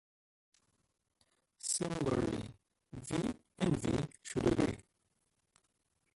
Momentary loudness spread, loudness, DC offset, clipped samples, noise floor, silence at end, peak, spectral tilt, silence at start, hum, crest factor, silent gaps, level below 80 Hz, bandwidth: 14 LU; -36 LUFS; under 0.1%; under 0.1%; -81 dBFS; 1.35 s; -18 dBFS; -5 dB/octave; 1.65 s; none; 22 dB; none; -58 dBFS; 11.5 kHz